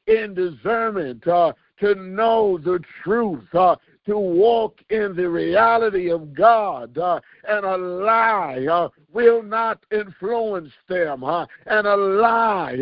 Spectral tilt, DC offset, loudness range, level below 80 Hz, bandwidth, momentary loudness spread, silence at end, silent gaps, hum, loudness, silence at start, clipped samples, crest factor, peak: -10.5 dB/octave; under 0.1%; 2 LU; -58 dBFS; 5.4 kHz; 9 LU; 0 s; none; none; -20 LUFS; 0.05 s; under 0.1%; 18 dB; -2 dBFS